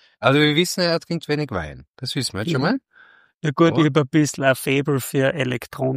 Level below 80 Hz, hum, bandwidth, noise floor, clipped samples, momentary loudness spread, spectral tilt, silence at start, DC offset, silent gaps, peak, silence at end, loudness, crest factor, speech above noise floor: -52 dBFS; none; 15.5 kHz; -52 dBFS; under 0.1%; 11 LU; -5 dB/octave; 0.2 s; under 0.1%; 1.89-1.94 s, 3.34-3.40 s; -2 dBFS; 0 s; -20 LUFS; 18 dB; 32 dB